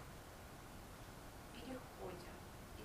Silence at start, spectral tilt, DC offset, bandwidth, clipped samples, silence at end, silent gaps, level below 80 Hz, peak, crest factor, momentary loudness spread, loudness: 0 s; -4.5 dB/octave; under 0.1%; 15.5 kHz; under 0.1%; 0 s; none; -62 dBFS; -36 dBFS; 18 dB; 5 LU; -54 LUFS